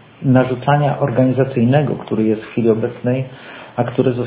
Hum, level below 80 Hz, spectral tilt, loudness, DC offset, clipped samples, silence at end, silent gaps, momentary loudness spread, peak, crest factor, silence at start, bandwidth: none; -50 dBFS; -12 dB/octave; -17 LUFS; under 0.1%; under 0.1%; 0 s; none; 8 LU; 0 dBFS; 16 dB; 0.2 s; 4 kHz